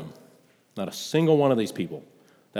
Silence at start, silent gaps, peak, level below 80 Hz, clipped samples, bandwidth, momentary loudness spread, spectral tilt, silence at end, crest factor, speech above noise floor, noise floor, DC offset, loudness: 0 s; none; -8 dBFS; -76 dBFS; under 0.1%; 16 kHz; 22 LU; -6 dB/octave; 0 s; 18 dB; 35 dB; -59 dBFS; under 0.1%; -25 LUFS